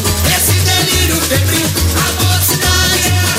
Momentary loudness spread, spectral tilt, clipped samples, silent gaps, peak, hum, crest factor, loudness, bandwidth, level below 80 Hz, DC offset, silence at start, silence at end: 2 LU; -3 dB/octave; under 0.1%; none; -2 dBFS; none; 10 dB; -11 LUFS; 16.5 kHz; -24 dBFS; under 0.1%; 0 s; 0 s